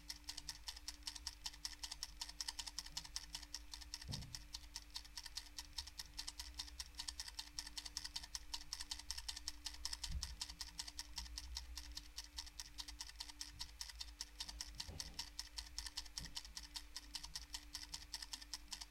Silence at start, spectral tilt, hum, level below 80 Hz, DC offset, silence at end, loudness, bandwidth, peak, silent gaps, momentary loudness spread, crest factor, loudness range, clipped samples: 0 s; -0.5 dB/octave; none; -58 dBFS; under 0.1%; 0 s; -49 LUFS; 16.5 kHz; -24 dBFS; none; 4 LU; 28 dB; 3 LU; under 0.1%